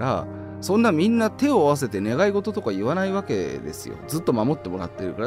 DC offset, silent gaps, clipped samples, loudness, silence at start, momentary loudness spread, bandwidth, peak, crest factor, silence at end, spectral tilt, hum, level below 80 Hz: under 0.1%; none; under 0.1%; -23 LUFS; 0 s; 12 LU; 16 kHz; -6 dBFS; 16 dB; 0 s; -6 dB/octave; none; -54 dBFS